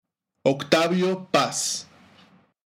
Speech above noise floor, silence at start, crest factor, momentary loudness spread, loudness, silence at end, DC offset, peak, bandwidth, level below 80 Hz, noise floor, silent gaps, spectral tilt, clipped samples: 34 dB; 0.45 s; 26 dB; 6 LU; -23 LUFS; 0.85 s; under 0.1%; 0 dBFS; 18 kHz; -72 dBFS; -56 dBFS; none; -3.5 dB/octave; under 0.1%